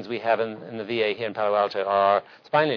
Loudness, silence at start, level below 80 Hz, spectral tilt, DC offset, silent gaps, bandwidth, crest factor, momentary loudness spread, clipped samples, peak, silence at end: -24 LUFS; 0 s; -74 dBFS; -6.5 dB/octave; under 0.1%; none; 5.4 kHz; 16 dB; 8 LU; under 0.1%; -8 dBFS; 0 s